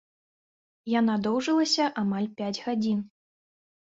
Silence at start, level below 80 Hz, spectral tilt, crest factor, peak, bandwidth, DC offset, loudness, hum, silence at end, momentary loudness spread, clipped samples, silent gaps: 0.85 s; -70 dBFS; -4.5 dB/octave; 16 dB; -12 dBFS; 7.8 kHz; under 0.1%; -27 LUFS; none; 0.85 s; 8 LU; under 0.1%; none